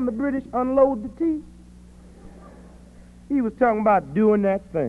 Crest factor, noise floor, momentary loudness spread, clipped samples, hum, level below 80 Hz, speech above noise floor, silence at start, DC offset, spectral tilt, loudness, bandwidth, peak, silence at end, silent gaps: 16 dB; -46 dBFS; 7 LU; under 0.1%; none; -48 dBFS; 25 dB; 0 s; under 0.1%; -9.5 dB/octave; -22 LUFS; 10.5 kHz; -6 dBFS; 0 s; none